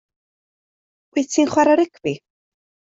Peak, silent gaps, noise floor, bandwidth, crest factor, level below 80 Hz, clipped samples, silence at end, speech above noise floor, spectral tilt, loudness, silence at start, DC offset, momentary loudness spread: -4 dBFS; none; under -90 dBFS; 8 kHz; 18 dB; -62 dBFS; under 0.1%; 0.8 s; over 72 dB; -4.5 dB/octave; -19 LUFS; 1.15 s; under 0.1%; 12 LU